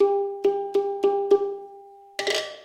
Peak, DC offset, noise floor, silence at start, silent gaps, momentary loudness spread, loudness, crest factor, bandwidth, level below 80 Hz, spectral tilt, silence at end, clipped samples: -8 dBFS; under 0.1%; -47 dBFS; 0 s; none; 14 LU; -24 LUFS; 16 dB; 13 kHz; -72 dBFS; -2.5 dB/octave; 0 s; under 0.1%